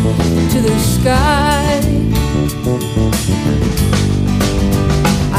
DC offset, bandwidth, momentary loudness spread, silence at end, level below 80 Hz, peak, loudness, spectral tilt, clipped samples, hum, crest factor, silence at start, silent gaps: under 0.1%; 16 kHz; 3 LU; 0 s; -22 dBFS; -2 dBFS; -14 LUFS; -5.5 dB/octave; under 0.1%; none; 12 dB; 0 s; none